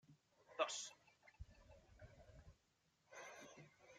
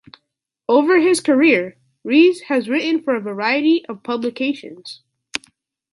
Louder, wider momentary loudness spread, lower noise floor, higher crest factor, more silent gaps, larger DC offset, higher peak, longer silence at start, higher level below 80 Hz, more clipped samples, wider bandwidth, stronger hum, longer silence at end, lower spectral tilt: second, -49 LUFS vs -17 LUFS; first, 24 LU vs 18 LU; first, -82 dBFS vs -76 dBFS; first, 28 dB vs 16 dB; neither; neither; second, -26 dBFS vs -2 dBFS; second, 0.05 s vs 0.7 s; about the same, -72 dBFS vs -70 dBFS; neither; first, 13.5 kHz vs 11.5 kHz; neither; second, 0 s vs 0.55 s; second, -2 dB/octave vs -4 dB/octave